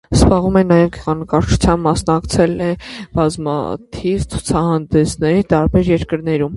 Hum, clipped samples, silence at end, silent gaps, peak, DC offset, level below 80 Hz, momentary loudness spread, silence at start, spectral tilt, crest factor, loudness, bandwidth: none; under 0.1%; 0 s; none; 0 dBFS; under 0.1%; -28 dBFS; 9 LU; 0.1 s; -6.5 dB/octave; 14 dB; -16 LUFS; 11.5 kHz